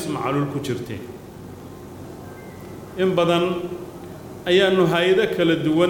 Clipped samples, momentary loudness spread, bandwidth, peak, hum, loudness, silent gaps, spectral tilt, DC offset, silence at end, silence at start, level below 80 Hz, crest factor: under 0.1%; 21 LU; 17.5 kHz; -6 dBFS; none; -20 LUFS; none; -6 dB/octave; under 0.1%; 0 s; 0 s; -54 dBFS; 16 dB